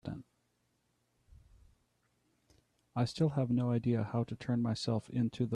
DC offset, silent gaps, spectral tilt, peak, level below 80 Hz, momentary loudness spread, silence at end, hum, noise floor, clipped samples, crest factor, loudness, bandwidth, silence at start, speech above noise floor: under 0.1%; none; -7.5 dB/octave; -20 dBFS; -66 dBFS; 7 LU; 0 s; 60 Hz at -50 dBFS; -78 dBFS; under 0.1%; 16 dB; -34 LUFS; 10.5 kHz; 0.05 s; 45 dB